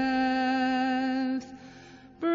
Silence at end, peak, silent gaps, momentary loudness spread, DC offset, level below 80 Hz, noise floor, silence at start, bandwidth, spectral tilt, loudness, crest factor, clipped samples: 0 s; -16 dBFS; none; 20 LU; under 0.1%; -62 dBFS; -50 dBFS; 0 s; 7.4 kHz; -5 dB/octave; -28 LUFS; 12 dB; under 0.1%